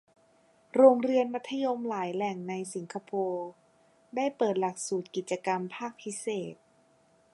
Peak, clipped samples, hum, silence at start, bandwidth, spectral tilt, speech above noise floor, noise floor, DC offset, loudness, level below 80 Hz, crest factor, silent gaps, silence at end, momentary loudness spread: -8 dBFS; under 0.1%; none; 0.75 s; 11.5 kHz; -5 dB/octave; 36 dB; -65 dBFS; under 0.1%; -30 LUFS; -84 dBFS; 24 dB; none; 0.8 s; 16 LU